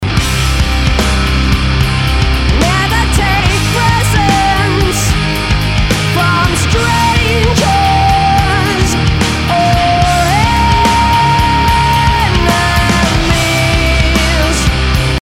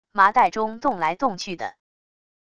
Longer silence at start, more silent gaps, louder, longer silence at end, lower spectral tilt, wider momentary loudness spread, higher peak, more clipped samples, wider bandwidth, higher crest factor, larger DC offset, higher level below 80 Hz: second, 0 s vs 0.15 s; neither; first, -11 LUFS vs -22 LUFS; second, 0 s vs 0.75 s; about the same, -4.5 dB/octave vs -4 dB/octave; second, 3 LU vs 15 LU; about the same, 0 dBFS vs -2 dBFS; neither; first, 16.5 kHz vs 11 kHz; second, 10 dB vs 20 dB; neither; first, -16 dBFS vs -60 dBFS